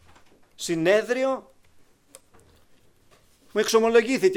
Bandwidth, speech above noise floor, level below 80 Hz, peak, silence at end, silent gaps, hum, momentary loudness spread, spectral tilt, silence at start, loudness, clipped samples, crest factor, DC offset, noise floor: 16.5 kHz; 37 dB; -62 dBFS; -6 dBFS; 0 s; none; none; 12 LU; -4 dB/octave; 0.6 s; -23 LUFS; under 0.1%; 18 dB; under 0.1%; -58 dBFS